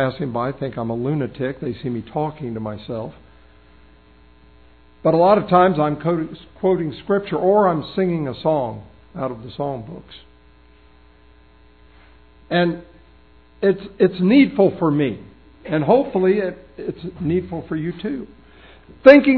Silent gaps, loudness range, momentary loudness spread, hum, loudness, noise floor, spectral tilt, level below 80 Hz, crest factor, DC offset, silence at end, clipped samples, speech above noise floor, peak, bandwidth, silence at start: none; 11 LU; 16 LU; none; -20 LUFS; -51 dBFS; -9.5 dB/octave; -50 dBFS; 20 dB; 0.2%; 0 s; under 0.1%; 32 dB; 0 dBFS; 5.4 kHz; 0 s